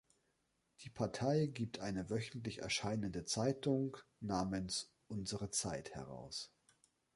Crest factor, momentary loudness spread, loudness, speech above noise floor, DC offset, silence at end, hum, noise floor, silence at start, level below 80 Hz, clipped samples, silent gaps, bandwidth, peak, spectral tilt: 18 dB; 12 LU; -41 LUFS; 41 dB; under 0.1%; 0.7 s; none; -82 dBFS; 0.8 s; -64 dBFS; under 0.1%; none; 11.5 kHz; -22 dBFS; -4.5 dB/octave